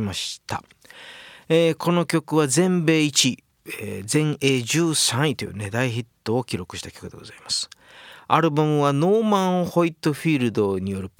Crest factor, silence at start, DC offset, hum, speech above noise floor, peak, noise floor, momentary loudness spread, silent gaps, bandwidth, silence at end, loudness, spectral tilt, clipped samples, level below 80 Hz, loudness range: 20 dB; 0 s; under 0.1%; none; 24 dB; -2 dBFS; -46 dBFS; 17 LU; none; 18 kHz; 0.1 s; -21 LUFS; -4.5 dB/octave; under 0.1%; -60 dBFS; 4 LU